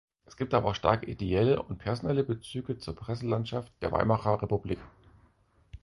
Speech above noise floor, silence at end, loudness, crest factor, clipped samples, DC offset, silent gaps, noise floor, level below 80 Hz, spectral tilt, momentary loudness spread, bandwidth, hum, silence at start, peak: 35 dB; 0.05 s; -30 LUFS; 22 dB; under 0.1%; under 0.1%; none; -65 dBFS; -50 dBFS; -7.5 dB/octave; 10 LU; 11.5 kHz; none; 0.4 s; -8 dBFS